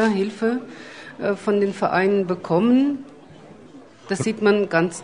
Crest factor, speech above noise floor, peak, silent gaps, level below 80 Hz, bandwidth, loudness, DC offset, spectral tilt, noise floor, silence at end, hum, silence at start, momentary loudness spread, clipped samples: 18 dB; 24 dB; -4 dBFS; none; -64 dBFS; 10 kHz; -21 LUFS; 0.1%; -6 dB/octave; -45 dBFS; 0 s; none; 0 s; 12 LU; under 0.1%